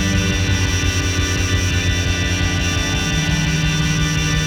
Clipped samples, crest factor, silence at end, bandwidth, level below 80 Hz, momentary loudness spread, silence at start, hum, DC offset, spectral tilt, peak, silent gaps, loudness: under 0.1%; 12 dB; 0 s; 16.5 kHz; -26 dBFS; 1 LU; 0 s; none; under 0.1%; -4 dB/octave; -6 dBFS; none; -18 LUFS